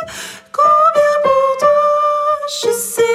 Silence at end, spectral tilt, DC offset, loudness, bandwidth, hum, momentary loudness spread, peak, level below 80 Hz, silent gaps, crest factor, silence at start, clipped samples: 0 s; -1.5 dB/octave; under 0.1%; -13 LUFS; 15.5 kHz; none; 9 LU; -2 dBFS; -58 dBFS; none; 12 dB; 0 s; under 0.1%